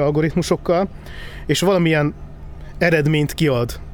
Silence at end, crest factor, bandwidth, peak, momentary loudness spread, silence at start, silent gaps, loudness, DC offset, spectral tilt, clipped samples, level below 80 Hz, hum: 0 s; 16 dB; 19.5 kHz; -2 dBFS; 20 LU; 0 s; none; -18 LUFS; under 0.1%; -6 dB/octave; under 0.1%; -36 dBFS; none